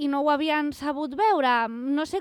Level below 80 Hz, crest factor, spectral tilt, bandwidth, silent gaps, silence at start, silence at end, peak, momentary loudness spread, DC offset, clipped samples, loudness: -62 dBFS; 14 dB; -4 dB/octave; 13.5 kHz; none; 0 s; 0 s; -12 dBFS; 7 LU; under 0.1%; under 0.1%; -24 LUFS